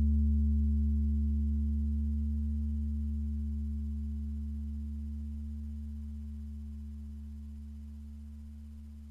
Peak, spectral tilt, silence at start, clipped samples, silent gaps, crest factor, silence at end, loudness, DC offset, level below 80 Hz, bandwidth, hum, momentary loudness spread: -22 dBFS; -10.5 dB/octave; 0 s; under 0.1%; none; 12 dB; 0 s; -35 LUFS; under 0.1%; -34 dBFS; 0.5 kHz; none; 17 LU